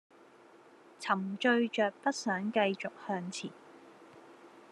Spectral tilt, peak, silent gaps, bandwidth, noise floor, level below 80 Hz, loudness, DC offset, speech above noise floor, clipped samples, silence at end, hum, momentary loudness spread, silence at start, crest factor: -4.5 dB/octave; -14 dBFS; none; 12 kHz; -59 dBFS; -88 dBFS; -33 LUFS; under 0.1%; 26 dB; under 0.1%; 0.1 s; none; 12 LU; 1 s; 20 dB